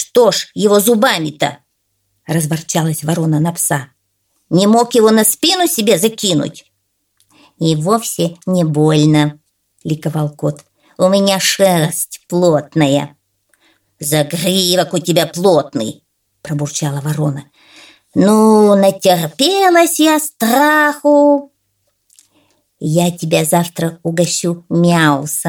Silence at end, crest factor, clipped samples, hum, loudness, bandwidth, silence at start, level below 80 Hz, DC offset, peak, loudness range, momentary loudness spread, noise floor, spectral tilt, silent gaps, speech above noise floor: 0 s; 14 dB; under 0.1%; none; -13 LUFS; 19 kHz; 0 s; -58 dBFS; under 0.1%; 0 dBFS; 5 LU; 10 LU; -66 dBFS; -4.5 dB/octave; none; 54 dB